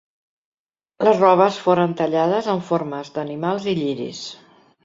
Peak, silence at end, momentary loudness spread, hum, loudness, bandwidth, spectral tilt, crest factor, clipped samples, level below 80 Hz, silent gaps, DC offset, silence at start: -2 dBFS; 0.5 s; 13 LU; none; -20 LUFS; 7.8 kHz; -6.5 dB/octave; 20 dB; under 0.1%; -64 dBFS; none; under 0.1%; 1 s